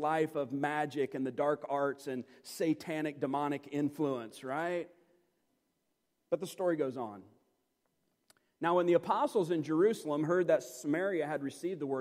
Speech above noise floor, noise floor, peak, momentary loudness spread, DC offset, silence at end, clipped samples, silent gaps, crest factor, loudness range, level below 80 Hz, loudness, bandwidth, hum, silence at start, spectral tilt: 48 dB; -81 dBFS; -16 dBFS; 10 LU; under 0.1%; 0 s; under 0.1%; none; 18 dB; 8 LU; -84 dBFS; -34 LUFS; 16 kHz; none; 0 s; -6 dB/octave